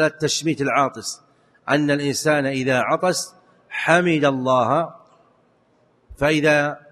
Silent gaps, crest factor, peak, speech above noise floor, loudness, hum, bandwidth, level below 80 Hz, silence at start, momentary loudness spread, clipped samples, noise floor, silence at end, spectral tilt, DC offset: none; 20 dB; 0 dBFS; 41 dB; -20 LUFS; none; 13 kHz; -54 dBFS; 0 s; 14 LU; under 0.1%; -60 dBFS; 0.15 s; -4.5 dB/octave; under 0.1%